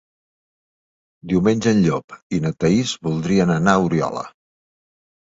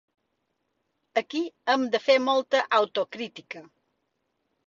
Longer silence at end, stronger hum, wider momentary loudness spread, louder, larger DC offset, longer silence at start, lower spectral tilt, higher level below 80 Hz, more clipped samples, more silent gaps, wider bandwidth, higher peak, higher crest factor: about the same, 1.05 s vs 1.05 s; neither; second, 10 LU vs 16 LU; first, -19 LUFS vs -25 LUFS; neither; about the same, 1.25 s vs 1.15 s; first, -6 dB/octave vs -3 dB/octave; first, -50 dBFS vs -78 dBFS; neither; first, 2.04-2.08 s, 2.22-2.30 s vs none; about the same, 8 kHz vs 7.4 kHz; first, 0 dBFS vs -8 dBFS; about the same, 20 dB vs 20 dB